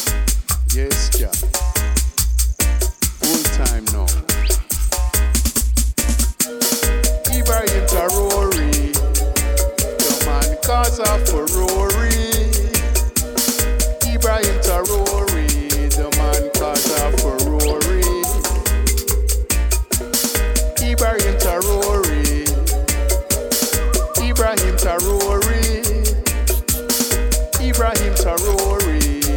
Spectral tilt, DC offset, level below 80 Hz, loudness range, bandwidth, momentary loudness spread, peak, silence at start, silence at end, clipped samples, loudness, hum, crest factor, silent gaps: -3.5 dB/octave; under 0.1%; -18 dBFS; 1 LU; 19 kHz; 2 LU; -2 dBFS; 0 s; 0 s; under 0.1%; -17 LUFS; none; 14 dB; none